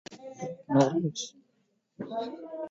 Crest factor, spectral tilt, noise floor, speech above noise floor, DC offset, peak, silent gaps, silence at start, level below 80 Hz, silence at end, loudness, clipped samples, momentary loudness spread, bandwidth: 22 dB; -6 dB/octave; -73 dBFS; 45 dB; under 0.1%; -10 dBFS; none; 0.1 s; -74 dBFS; 0 s; -31 LUFS; under 0.1%; 16 LU; 8 kHz